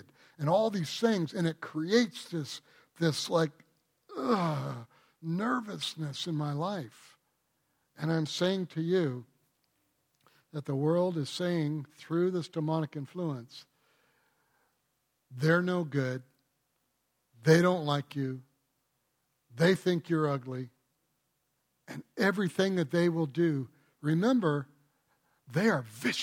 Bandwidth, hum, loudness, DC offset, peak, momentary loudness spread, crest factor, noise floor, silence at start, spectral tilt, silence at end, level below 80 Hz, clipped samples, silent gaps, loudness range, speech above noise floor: 16 kHz; none; -31 LUFS; under 0.1%; -10 dBFS; 15 LU; 22 dB; -78 dBFS; 0.4 s; -6 dB/octave; 0 s; -76 dBFS; under 0.1%; none; 5 LU; 48 dB